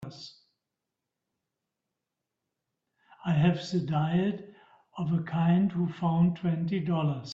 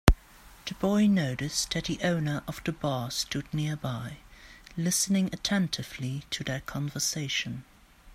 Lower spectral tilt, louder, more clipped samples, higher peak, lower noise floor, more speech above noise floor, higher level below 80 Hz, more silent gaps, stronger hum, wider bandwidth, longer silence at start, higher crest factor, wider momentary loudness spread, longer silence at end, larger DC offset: first, -8 dB/octave vs -4 dB/octave; about the same, -28 LUFS vs -29 LUFS; neither; second, -12 dBFS vs 0 dBFS; first, -87 dBFS vs -53 dBFS; first, 60 dB vs 23 dB; second, -66 dBFS vs -40 dBFS; neither; neither; second, 7.4 kHz vs 16 kHz; about the same, 0 s vs 0.05 s; second, 18 dB vs 30 dB; about the same, 15 LU vs 13 LU; about the same, 0 s vs 0 s; neither